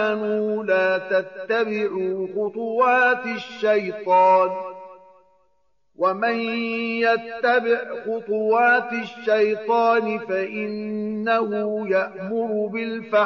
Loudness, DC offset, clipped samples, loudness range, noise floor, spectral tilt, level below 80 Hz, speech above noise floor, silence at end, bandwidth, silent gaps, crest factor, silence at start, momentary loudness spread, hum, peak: -22 LUFS; under 0.1%; under 0.1%; 3 LU; -70 dBFS; -2.5 dB/octave; -72 dBFS; 49 dB; 0 s; 6.8 kHz; none; 14 dB; 0 s; 10 LU; none; -8 dBFS